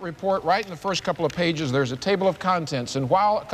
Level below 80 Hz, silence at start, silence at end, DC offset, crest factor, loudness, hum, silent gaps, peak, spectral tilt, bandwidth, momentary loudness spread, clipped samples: -56 dBFS; 0 s; 0 s; under 0.1%; 16 dB; -24 LUFS; none; none; -8 dBFS; -5 dB/octave; 14.5 kHz; 5 LU; under 0.1%